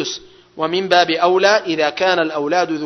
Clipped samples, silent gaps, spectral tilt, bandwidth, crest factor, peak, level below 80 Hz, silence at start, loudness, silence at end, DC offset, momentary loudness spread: under 0.1%; none; -3.5 dB/octave; 6.4 kHz; 16 dB; 0 dBFS; -62 dBFS; 0 s; -16 LUFS; 0 s; under 0.1%; 10 LU